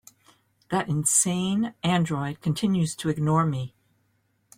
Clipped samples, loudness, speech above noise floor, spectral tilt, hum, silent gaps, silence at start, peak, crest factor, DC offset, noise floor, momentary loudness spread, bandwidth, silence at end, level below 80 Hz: under 0.1%; -25 LUFS; 45 dB; -4.5 dB/octave; none; none; 0.7 s; -8 dBFS; 18 dB; under 0.1%; -70 dBFS; 8 LU; 16 kHz; 0.9 s; -60 dBFS